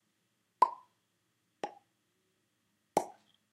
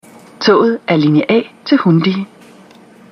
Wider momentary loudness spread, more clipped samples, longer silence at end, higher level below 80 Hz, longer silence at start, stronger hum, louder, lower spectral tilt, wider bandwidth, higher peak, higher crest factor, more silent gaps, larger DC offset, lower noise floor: first, 16 LU vs 6 LU; neither; second, 0.4 s vs 0.85 s; second, under -90 dBFS vs -60 dBFS; first, 0.6 s vs 0.4 s; neither; second, -35 LUFS vs -13 LUFS; second, -4 dB/octave vs -7 dB/octave; first, 14.5 kHz vs 9.6 kHz; second, -10 dBFS vs 0 dBFS; first, 30 dB vs 14 dB; neither; neither; first, -79 dBFS vs -41 dBFS